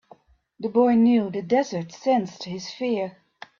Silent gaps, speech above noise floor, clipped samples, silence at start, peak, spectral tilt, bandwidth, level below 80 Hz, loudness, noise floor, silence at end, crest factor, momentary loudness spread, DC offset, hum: none; 32 dB; under 0.1%; 0.6 s; -8 dBFS; -6 dB/octave; 7.2 kHz; -66 dBFS; -23 LUFS; -54 dBFS; 0.5 s; 16 dB; 15 LU; under 0.1%; none